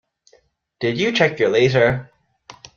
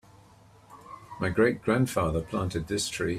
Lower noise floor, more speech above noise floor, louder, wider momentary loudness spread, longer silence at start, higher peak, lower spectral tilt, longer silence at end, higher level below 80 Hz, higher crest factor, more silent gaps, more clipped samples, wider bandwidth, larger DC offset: first, -59 dBFS vs -55 dBFS; first, 41 dB vs 28 dB; first, -18 LUFS vs -28 LUFS; second, 9 LU vs 19 LU; about the same, 0.8 s vs 0.7 s; first, -2 dBFS vs -10 dBFS; about the same, -5.5 dB/octave vs -5 dB/octave; first, 0.7 s vs 0 s; about the same, -54 dBFS vs -50 dBFS; about the same, 18 dB vs 20 dB; neither; neither; second, 7.2 kHz vs 15.5 kHz; neither